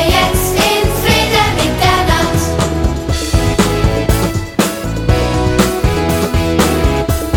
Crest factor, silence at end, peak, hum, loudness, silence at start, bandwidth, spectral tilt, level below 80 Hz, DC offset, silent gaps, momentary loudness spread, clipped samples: 12 dB; 0 s; 0 dBFS; none; -13 LUFS; 0 s; 19.5 kHz; -4.5 dB/octave; -20 dBFS; under 0.1%; none; 4 LU; under 0.1%